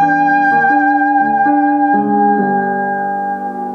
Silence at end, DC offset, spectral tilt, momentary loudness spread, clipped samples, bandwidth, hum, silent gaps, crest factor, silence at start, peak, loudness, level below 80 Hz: 0 s; under 0.1%; -8.5 dB/octave; 7 LU; under 0.1%; 6 kHz; none; none; 10 dB; 0 s; -2 dBFS; -13 LUFS; -64 dBFS